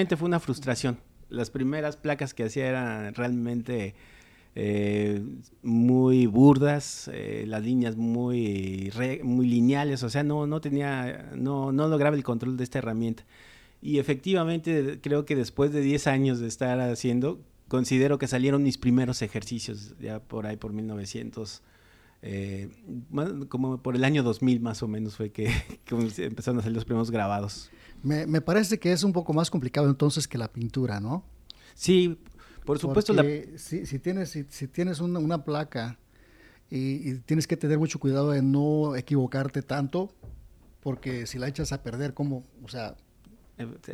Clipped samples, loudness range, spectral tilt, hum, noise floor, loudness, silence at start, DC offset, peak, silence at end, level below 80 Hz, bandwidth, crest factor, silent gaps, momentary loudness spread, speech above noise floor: under 0.1%; 8 LU; -6.5 dB/octave; none; -58 dBFS; -27 LUFS; 0 s; under 0.1%; -6 dBFS; 0 s; -52 dBFS; 14.5 kHz; 22 dB; none; 13 LU; 31 dB